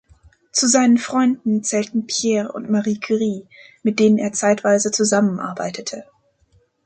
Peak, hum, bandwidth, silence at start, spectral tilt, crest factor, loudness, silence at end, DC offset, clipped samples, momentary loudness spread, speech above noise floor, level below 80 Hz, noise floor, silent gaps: -4 dBFS; none; 9.4 kHz; 0.55 s; -4 dB/octave; 16 dB; -19 LUFS; 0.8 s; under 0.1%; under 0.1%; 11 LU; 41 dB; -62 dBFS; -60 dBFS; none